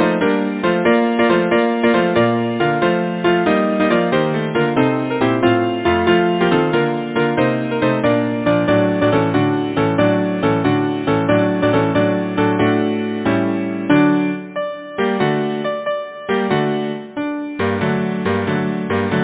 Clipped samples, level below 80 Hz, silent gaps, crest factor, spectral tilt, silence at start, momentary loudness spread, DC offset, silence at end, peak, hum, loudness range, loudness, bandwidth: under 0.1%; -46 dBFS; none; 16 dB; -10.5 dB/octave; 0 s; 6 LU; under 0.1%; 0 s; 0 dBFS; none; 4 LU; -17 LUFS; 4 kHz